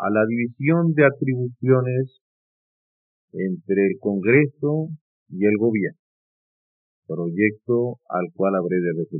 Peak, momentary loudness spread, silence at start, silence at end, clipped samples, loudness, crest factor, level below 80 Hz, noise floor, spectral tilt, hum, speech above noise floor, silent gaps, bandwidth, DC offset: -4 dBFS; 11 LU; 0 s; 0 s; under 0.1%; -21 LUFS; 18 dB; -84 dBFS; under -90 dBFS; -9 dB/octave; none; over 69 dB; 2.21-3.28 s, 5.01-5.26 s, 5.99-7.02 s; 3.9 kHz; under 0.1%